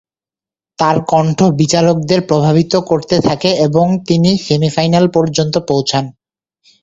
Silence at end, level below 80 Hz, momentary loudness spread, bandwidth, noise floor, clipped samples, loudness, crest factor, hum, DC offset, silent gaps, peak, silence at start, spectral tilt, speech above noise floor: 0.7 s; -46 dBFS; 3 LU; 8 kHz; under -90 dBFS; under 0.1%; -13 LUFS; 14 dB; none; under 0.1%; none; 0 dBFS; 0.8 s; -6 dB/octave; over 78 dB